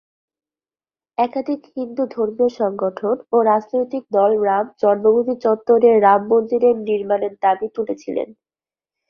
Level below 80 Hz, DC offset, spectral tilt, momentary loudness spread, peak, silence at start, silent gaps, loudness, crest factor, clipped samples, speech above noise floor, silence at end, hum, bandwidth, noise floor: -64 dBFS; under 0.1%; -7.5 dB/octave; 11 LU; -2 dBFS; 1.2 s; none; -18 LUFS; 18 dB; under 0.1%; over 73 dB; 0.75 s; none; 6.4 kHz; under -90 dBFS